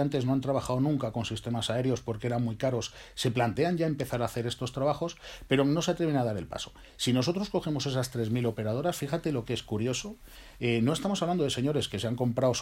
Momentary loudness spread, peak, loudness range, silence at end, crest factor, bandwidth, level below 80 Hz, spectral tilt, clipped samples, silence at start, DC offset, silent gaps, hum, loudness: 7 LU; -12 dBFS; 2 LU; 0 s; 18 dB; 16 kHz; -54 dBFS; -5.5 dB/octave; under 0.1%; 0 s; under 0.1%; none; none; -30 LUFS